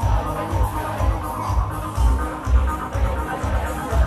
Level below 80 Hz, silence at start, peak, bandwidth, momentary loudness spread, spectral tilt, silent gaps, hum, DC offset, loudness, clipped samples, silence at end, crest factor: -22 dBFS; 0 s; -6 dBFS; 14 kHz; 3 LU; -6.5 dB/octave; none; none; under 0.1%; -23 LUFS; under 0.1%; 0 s; 16 dB